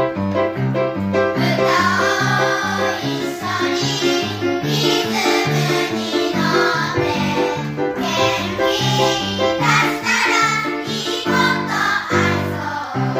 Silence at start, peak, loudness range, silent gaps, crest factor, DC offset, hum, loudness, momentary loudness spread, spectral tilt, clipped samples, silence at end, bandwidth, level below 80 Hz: 0 s; -4 dBFS; 2 LU; none; 14 dB; under 0.1%; none; -18 LUFS; 6 LU; -4.5 dB/octave; under 0.1%; 0 s; 16 kHz; -52 dBFS